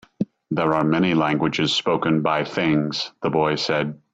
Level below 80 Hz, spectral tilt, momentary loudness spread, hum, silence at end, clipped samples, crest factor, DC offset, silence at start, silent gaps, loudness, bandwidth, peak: -56 dBFS; -5.5 dB/octave; 6 LU; none; 0.2 s; under 0.1%; 16 dB; under 0.1%; 0.2 s; none; -21 LUFS; 8 kHz; -6 dBFS